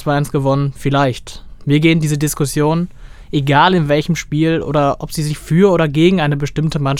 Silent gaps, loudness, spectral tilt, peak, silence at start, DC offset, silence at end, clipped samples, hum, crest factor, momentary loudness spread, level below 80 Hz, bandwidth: none; -15 LUFS; -6 dB/octave; 0 dBFS; 0 s; under 0.1%; 0 s; under 0.1%; none; 14 dB; 9 LU; -36 dBFS; 15.5 kHz